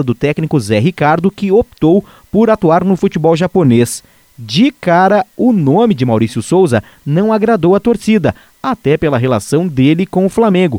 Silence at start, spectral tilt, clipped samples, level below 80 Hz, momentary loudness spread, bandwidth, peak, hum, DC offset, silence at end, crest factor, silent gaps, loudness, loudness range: 0 s; -7 dB/octave; under 0.1%; -42 dBFS; 5 LU; 16.5 kHz; 0 dBFS; none; under 0.1%; 0 s; 12 dB; none; -12 LUFS; 1 LU